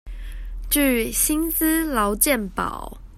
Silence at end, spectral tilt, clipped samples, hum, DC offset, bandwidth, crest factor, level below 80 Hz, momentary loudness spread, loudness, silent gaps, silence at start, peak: 0 s; -3 dB/octave; under 0.1%; none; under 0.1%; 16 kHz; 20 dB; -34 dBFS; 18 LU; -20 LUFS; none; 0.05 s; -2 dBFS